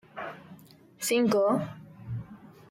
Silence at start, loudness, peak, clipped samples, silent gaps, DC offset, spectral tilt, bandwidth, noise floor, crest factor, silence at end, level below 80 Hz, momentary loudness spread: 0.15 s; -28 LUFS; -14 dBFS; under 0.1%; none; under 0.1%; -5 dB/octave; 16.5 kHz; -53 dBFS; 18 dB; 0.2 s; -64 dBFS; 22 LU